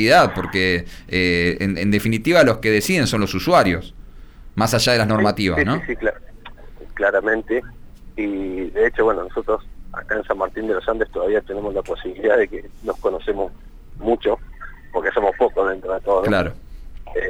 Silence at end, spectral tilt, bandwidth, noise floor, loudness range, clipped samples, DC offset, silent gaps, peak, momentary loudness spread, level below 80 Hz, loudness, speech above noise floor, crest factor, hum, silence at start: 0 s; -5 dB/octave; over 20 kHz; -39 dBFS; 5 LU; under 0.1%; under 0.1%; none; -4 dBFS; 12 LU; -38 dBFS; -20 LUFS; 20 dB; 16 dB; none; 0 s